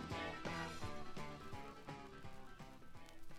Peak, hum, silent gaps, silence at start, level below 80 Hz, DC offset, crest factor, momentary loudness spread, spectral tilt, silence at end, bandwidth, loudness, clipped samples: -32 dBFS; none; none; 0 s; -60 dBFS; under 0.1%; 16 dB; 13 LU; -5 dB/octave; 0 s; 15 kHz; -50 LUFS; under 0.1%